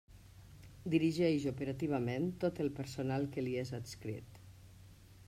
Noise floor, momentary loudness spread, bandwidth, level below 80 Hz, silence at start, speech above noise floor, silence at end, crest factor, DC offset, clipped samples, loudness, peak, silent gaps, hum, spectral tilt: -58 dBFS; 24 LU; 15.5 kHz; -64 dBFS; 0.1 s; 22 dB; 0 s; 18 dB; under 0.1%; under 0.1%; -37 LUFS; -20 dBFS; none; none; -7 dB/octave